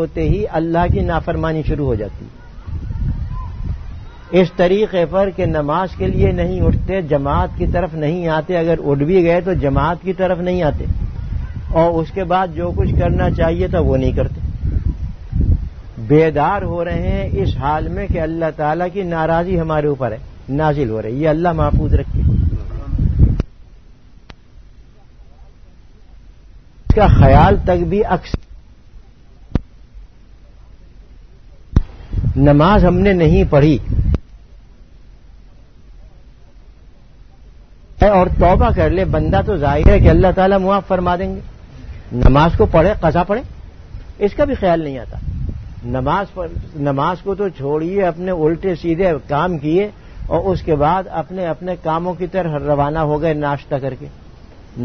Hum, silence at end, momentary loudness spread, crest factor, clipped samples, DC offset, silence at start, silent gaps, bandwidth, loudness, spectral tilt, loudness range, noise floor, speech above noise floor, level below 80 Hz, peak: none; 0 s; 14 LU; 16 dB; under 0.1%; 0.4%; 0 s; none; 6.4 kHz; -16 LUFS; -9 dB/octave; 7 LU; -43 dBFS; 28 dB; -24 dBFS; 0 dBFS